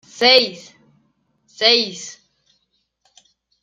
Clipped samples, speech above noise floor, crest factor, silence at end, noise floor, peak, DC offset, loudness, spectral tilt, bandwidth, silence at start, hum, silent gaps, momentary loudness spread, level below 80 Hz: under 0.1%; 53 dB; 20 dB; 1.5 s; -69 dBFS; 0 dBFS; under 0.1%; -15 LUFS; -1.5 dB/octave; 14 kHz; 0.2 s; none; none; 20 LU; -72 dBFS